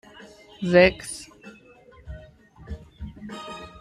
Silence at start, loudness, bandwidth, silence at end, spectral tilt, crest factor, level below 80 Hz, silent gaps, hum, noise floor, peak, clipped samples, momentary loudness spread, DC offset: 0.6 s; -21 LUFS; 13.5 kHz; 0.15 s; -5 dB/octave; 24 dB; -46 dBFS; none; none; -51 dBFS; -2 dBFS; under 0.1%; 26 LU; under 0.1%